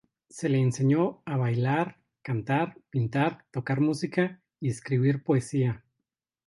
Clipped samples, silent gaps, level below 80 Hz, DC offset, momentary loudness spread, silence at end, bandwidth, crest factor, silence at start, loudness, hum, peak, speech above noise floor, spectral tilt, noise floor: under 0.1%; none; -64 dBFS; under 0.1%; 9 LU; 0.7 s; 11.5 kHz; 18 dB; 0.35 s; -28 LUFS; none; -10 dBFS; 59 dB; -7.5 dB/octave; -85 dBFS